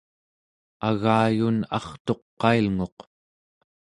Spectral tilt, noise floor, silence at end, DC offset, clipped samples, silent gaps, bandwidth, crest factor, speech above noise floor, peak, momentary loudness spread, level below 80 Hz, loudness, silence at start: -7.5 dB/octave; under -90 dBFS; 0.9 s; under 0.1%; under 0.1%; 2.00-2.05 s, 2.22-2.37 s, 2.92-2.97 s; 10.5 kHz; 20 dB; over 67 dB; -6 dBFS; 9 LU; -54 dBFS; -24 LUFS; 0.8 s